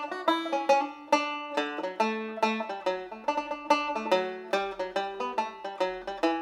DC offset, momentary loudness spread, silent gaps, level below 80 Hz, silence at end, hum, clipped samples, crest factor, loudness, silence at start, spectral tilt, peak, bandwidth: under 0.1%; 6 LU; none; -68 dBFS; 0 s; none; under 0.1%; 20 dB; -30 LUFS; 0 s; -3.5 dB/octave; -8 dBFS; 14 kHz